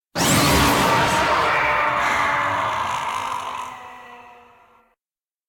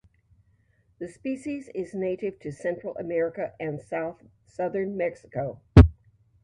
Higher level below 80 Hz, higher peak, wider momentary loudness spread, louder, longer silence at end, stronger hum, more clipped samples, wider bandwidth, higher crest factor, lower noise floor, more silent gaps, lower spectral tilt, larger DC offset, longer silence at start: second, -40 dBFS vs -32 dBFS; second, -6 dBFS vs 0 dBFS; about the same, 16 LU vs 17 LU; first, -19 LUFS vs -26 LUFS; first, 1.15 s vs 0.5 s; neither; neither; first, 18 kHz vs 9.6 kHz; second, 16 dB vs 26 dB; first, under -90 dBFS vs -65 dBFS; neither; second, -3.5 dB/octave vs -9 dB/octave; neither; second, 0.15 s vs 1 s